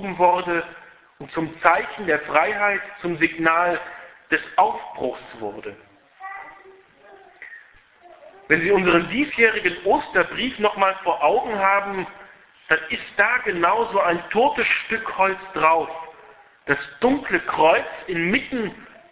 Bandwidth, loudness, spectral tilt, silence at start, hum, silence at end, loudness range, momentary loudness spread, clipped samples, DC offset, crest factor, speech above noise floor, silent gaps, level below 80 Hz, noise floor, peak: 4 kHz; -21 LUFS; -8 dB/octave; 0 s; none; 0.25 s; 7 LU; 17 LU; under 0.1%; under 0.1%; 22 dB; 30 dB; none; -56 dBFS; -51 dBFS; 0 dBFS